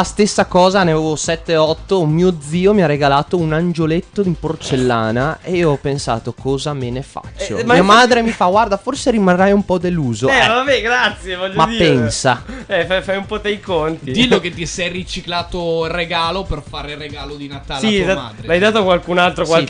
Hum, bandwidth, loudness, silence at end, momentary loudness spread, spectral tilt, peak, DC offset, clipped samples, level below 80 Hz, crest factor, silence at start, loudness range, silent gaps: none; 10.5 kHz; -15 LUFS; 0 s; 10 LU; -5 dB/octave; -2 dBFS; under 0.1%; under 0.1%; -36 dBFS; 14 dB; 0 s; 5 LU; none